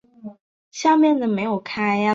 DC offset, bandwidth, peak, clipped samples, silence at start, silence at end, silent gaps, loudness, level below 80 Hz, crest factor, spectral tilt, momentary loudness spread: under 0.1%; 7.6 kHz; -6 dBFS; under 0.1%; 0.25 s; 0 s; 0.41-0.71 s; -20 LUFS; -66 dBFS; 14 dB; -5.5 dB/octave; 24 LU